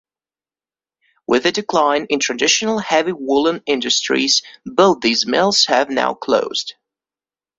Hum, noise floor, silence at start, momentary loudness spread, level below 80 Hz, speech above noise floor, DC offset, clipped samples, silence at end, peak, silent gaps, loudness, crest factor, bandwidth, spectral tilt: none; under -90 dBFS; 1.3 s; 6 LU; -60 dBFS; over 73 dB; under 0.1%; under 0.1%; 0.85 s; 0 dBFS; none; -16 LUFS; 18 dB; 8.2 kHz; -2 dB/octave